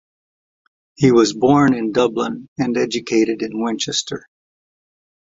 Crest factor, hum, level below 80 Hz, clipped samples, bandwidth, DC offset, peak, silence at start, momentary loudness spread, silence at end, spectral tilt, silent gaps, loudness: 18 dB; none; -54 dBFS; under 0.1%; 8 kHz; under 0.1%; -2 dBFS; 1 s; 10 LU; 1.05 s; -5 dB/octave; 2.48-2.56 s; -17 LUFS